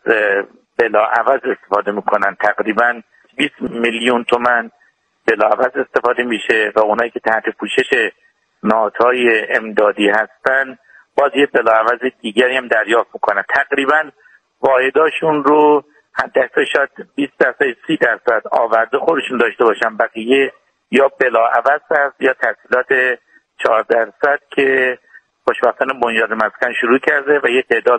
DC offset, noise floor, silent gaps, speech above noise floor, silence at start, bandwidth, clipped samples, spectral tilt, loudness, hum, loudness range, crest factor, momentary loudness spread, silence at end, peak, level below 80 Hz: under 0.1%; -57 dBFS; none; 42 dB; 0.05 s; 9.2 kHz; under 0.1%; -4.5 dB/octave; -15 LUFS; none; 2 LU; 16 dB; 6 LU; 0 s; 0 dBFS; -60 dBFS